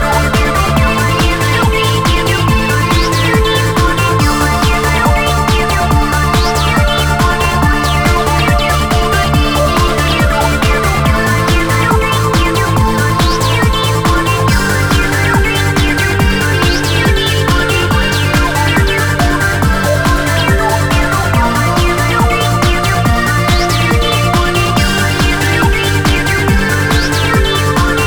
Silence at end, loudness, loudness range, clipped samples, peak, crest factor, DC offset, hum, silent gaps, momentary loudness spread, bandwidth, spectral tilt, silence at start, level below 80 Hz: 0 s; -11 LUFS; 0 LU; under 0.1%; 0 dBFS; 10 dB; 0.9%; none; none; 1 LU; over 20 kHz; -4.5 dB/octave; 0 s; -18 dBFS